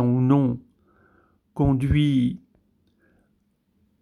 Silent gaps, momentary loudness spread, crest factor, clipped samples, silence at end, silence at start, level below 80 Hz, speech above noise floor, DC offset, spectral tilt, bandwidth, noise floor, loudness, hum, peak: none; 17 LU; 18 dB; under 0.1%; 1.65 s; 0 s; -42 dBFS; 48 dB; under 0.1%; -9 dB/octave; 11 kHz; -68 dBFS; -22 LUFS; none; -8 dBFS